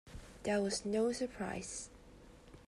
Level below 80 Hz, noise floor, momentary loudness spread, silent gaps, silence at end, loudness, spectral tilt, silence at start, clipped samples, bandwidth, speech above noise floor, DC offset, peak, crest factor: -60 dBFS; -58 dBFS; 17 LU; none; 0.05 s; -38 LUFS; -4 dB/octave; 0.05 s; under 0.1%; 13 kHz; 21 dB; under 0.1%; -22 dBFS; 16 dB